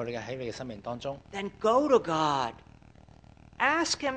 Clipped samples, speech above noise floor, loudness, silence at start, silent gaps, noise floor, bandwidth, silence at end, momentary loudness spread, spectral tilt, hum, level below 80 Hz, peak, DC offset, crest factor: under 0.1%; 25 dB; -29 LUFS; 0 s; none; -54 dBFS; 9.8 kHz; 0 s; 13 LU; -4 dB/octave; none; -60 dBFS; -10 dBFS; under 0.1%; 20 dB